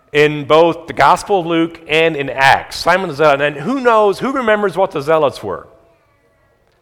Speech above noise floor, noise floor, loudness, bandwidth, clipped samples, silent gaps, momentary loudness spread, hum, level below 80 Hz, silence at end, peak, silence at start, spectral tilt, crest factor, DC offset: 42 dB; -56 dBFS; -14 LUFS; 18.5 kHz; 0.2%; none; 6 LU; none; -48 dBFS; 1.2 s; 0 dBFS; 0.15 s; -5 dB/octave; 14 dB; under 0.1%